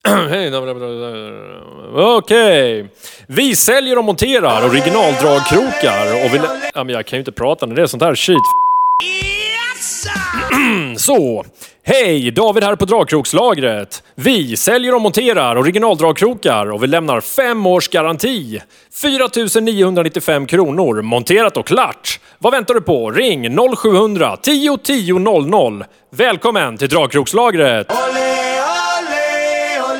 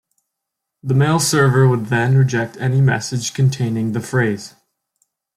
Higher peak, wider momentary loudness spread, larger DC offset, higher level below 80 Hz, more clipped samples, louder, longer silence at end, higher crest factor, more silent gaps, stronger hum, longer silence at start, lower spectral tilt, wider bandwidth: about the same, 0 dBFS vs -2 dBFS; about the same, 8 LU vs 8 LU; neither; first, -46 dBFS vs -56 dBFS; neither; first, -13 LUFS vs -17 LUFS; second, 0 s vs 0.9 s; about the same, 14 dB vs 14 dB; neither; neither; second, 0.05 s vs 0.85 s; second, -3.5 dB/octave vs -5.5 dB/octave; first, 19 kHz vs 14 kHz